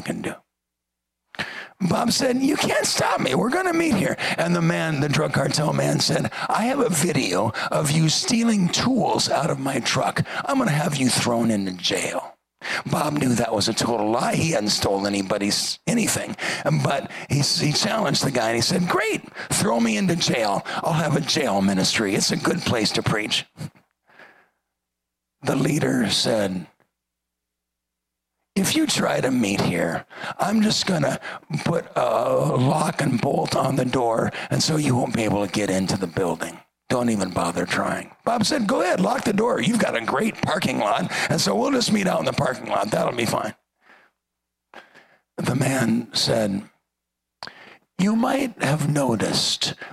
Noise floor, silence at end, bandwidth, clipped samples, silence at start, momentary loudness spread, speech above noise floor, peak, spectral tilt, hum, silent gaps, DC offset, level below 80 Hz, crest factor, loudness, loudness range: -82 dBFS; 0 s; 15.5 kHz; under 0.1%; 0 s; 7 LU; 61 dB; -6 dBFS; -4.5 dB/octave; none; none; under 0.1%; -56 dBFS; 18 dB; -22 LUFS; 4 LU